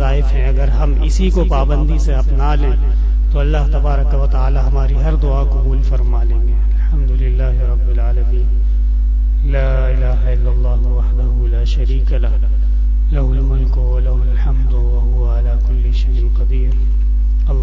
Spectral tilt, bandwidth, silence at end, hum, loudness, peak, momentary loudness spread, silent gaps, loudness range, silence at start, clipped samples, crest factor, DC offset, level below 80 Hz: -8 dB/octave; 6 kHz; 0 s; 50 Hz at -10 dBFS; -16 LUFS; -4 dBFS; 1 LU; none; 1 LU; 0 s; under 0.1%; 8 dB; under 0.1%; -12 dBFS